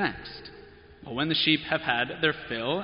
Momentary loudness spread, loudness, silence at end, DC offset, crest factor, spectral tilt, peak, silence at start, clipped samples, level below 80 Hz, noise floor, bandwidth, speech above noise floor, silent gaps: 18 LU; -26 LUFS; 0 s; under 0.1%; 20 dB; -2 dB/octave; -8 dBFS; 0 s; under 0.1%; -56 dBFS; -50 dBFS; 5.4 kHz; 22 dB; none